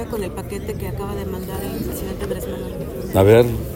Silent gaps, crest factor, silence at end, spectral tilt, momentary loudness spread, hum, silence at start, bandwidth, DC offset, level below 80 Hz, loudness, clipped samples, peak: none; 20 dB; 0 s; -6.5 dB/octave; 15 LU; none; 0 s; 17 kHz; under 0.1%; -34 dBFS; -21 LUFS; under 0.1%; 0 dBFS